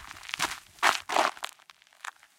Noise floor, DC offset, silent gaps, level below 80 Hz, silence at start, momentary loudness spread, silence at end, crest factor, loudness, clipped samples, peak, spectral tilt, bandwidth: -57 dBFS; under 0.1%; none; -66 dBFS; 0 s; 18 LU; 0.3 s; 28 dB; -28 LUFS; under 0.1%; -4 dBFS; -0.5 dB/octave; 17 kHz